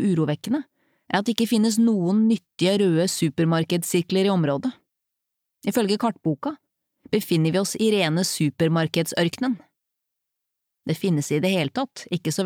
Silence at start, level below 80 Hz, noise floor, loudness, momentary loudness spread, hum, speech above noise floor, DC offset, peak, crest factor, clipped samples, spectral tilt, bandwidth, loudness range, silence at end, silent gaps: 0 s; -68 dBFS; -82 dBFS; -23 LUFS; 8 LU; none; 60 dB; under 0.1%; -4 dBFS; 20 dB; under 0.1%; -5.5 dB/octave; 19 kHz; 5 LU; 0 s; none